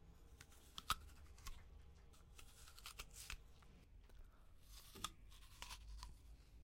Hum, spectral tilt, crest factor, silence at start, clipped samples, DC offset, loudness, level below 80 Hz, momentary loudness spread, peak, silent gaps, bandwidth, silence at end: none; -2 dB/octave; 34 dB; 0 s; under 0.1%; under 0.1%; -55 LUFS; -62 dBFS; 21 LU; -22 dBFS; none; 16.5 kHz; 0 s